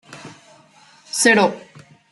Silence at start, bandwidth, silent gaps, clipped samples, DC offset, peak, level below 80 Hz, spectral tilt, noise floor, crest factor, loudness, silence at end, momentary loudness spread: 0.1 s; 12.5 kHz; none; under 0.1%; under 0.1%; -2 dBFS; -70 dBFS; -2.5 dB/octave; -50 dBFS; 20 dB; -16 LUFS; 0.55 s; 25 LU